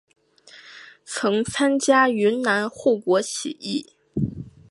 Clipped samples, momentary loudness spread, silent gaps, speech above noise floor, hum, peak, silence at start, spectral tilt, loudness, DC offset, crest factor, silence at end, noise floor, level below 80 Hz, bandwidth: under 0.1%; 23 LU; none; 29 dB; none; -4 dBFS; 0.55 s; -4 dB/octave; -22 LUFS; under 0.1%; 18 dB; 0.2 s; -50 dBFS; -54 dBFS; 11.5 kHz